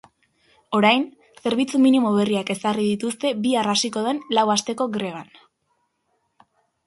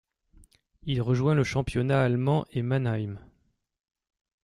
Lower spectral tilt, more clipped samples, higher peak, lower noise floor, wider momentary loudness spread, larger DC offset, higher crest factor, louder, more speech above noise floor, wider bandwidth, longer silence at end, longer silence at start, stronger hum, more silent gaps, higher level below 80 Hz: second, -4 dB/octave vs -7.5 dB/octave; neither; first, -2 dBFS vs -10 dBFS; about the same, -71 dBFS vs -71 dBFS; about the same, 9 LU vs 11 LU; neither; about the same, 20 dB vs 18 dB; first, -21 LUFS vs -27 LUFS; first, 50 dB vs 46 dB; about the same, 11.5 kHz vs 11 kHz; first, 1.65 s vs 1.25 s; second, 0.7 s vs 0.85 s; neither; neither; second, -66 dBFS vs -52 dBFS